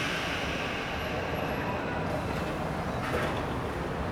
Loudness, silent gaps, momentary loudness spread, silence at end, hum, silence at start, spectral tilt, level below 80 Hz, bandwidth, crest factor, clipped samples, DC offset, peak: -32 LUFS; none; 2 LU; 0 s; none; 0 s; -5.5 dB/octave; -44 dBFS; over 20 kHz; 14 dB; under 0.1%; under 0.1%; -16 dBFS